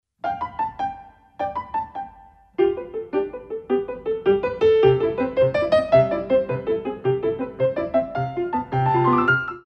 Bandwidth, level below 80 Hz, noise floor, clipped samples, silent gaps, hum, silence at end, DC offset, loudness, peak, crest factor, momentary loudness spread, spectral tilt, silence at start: 8.2 kHz; -50 dBFS; -49 dBFS; under 0.1%; none; none; 0.05 s; under 0.1%; -22 LUFS; -4 dBFS; 18 dB; 13 LU; -8.5 dB/octave; 0.25 s